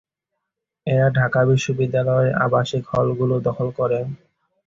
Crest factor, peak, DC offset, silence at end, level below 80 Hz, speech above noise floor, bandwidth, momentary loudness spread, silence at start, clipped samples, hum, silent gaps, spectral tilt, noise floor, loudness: 16 dB; -4 dBFS; under 0.1%; 0.5 s; -52 dBFS; 62 dB; 7.6 kHz; 7 LU; 0.85 s; under 0.1%; none; none; -7 dB/octave; -81 dBFS; -20 LUFS